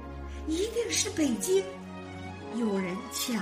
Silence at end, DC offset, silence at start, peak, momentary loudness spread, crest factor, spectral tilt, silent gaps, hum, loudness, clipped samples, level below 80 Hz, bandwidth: 0 s; under 0.1%; 0 s; -14 dBFS; 14 LU; 18 dB; -3.5 dB/octave; none; none; -30 LUFS; under 0.1%; -48 dBFS; 15.5 kHz